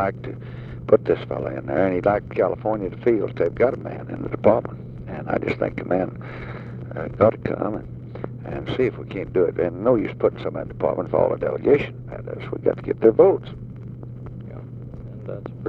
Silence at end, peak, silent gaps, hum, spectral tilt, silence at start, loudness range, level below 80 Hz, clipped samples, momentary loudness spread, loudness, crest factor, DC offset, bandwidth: 0 s; -2 dBFS; none; none; -9.5 dB/octave; 0 s; 4 LU; -46 dBFS; under 0.1%; 17 LU; -22 LUFS; 22 dB; under 0.1%; 5.2 kHz